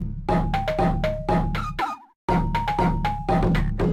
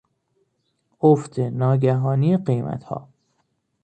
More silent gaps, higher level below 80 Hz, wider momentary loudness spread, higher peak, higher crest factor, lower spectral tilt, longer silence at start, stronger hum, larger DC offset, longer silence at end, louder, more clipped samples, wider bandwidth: first, 2.16-2.28 s vs none; first, -30 dBFS vs -60 dBFS; second, 5 LU vs 13 LU; second, -10 dBFS vs -4 dBFS; second, 12 dB vs 18 dB; second, -7.5 dB/octave vs -9.5 dB/octave; second, 0 s vs 1.05 s; neither; first, 0.1% vs under 0.1%; second, 0 s vs 0.8 s; second, -24 LUFS vs -21 LUFS; neither; first, 13.5 kHz vs 9 kHz